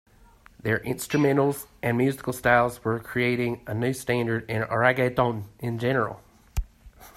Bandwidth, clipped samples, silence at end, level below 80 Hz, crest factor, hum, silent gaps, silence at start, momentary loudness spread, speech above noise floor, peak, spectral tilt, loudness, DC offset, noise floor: 16 kHz; under 0.1%; 0.05 s; -46 dBFS; 20 dB; none; none; 0.65 s; 12 LU; 30 dB; -6 dBFS; -6 dB/octave; -25 LUFS; under 0.1%; -54 dBFS